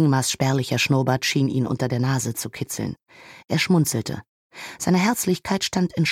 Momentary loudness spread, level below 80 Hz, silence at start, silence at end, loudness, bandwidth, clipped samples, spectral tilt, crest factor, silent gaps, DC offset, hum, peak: 11 LU; -56 dBFS; 0 s; 0 s; -22 LUFS; 16.5 kHz; under 0.1%; -5 dB/octave; 16 dB; 4.29-4.50 s; under 0.1%; none; -6 dBFS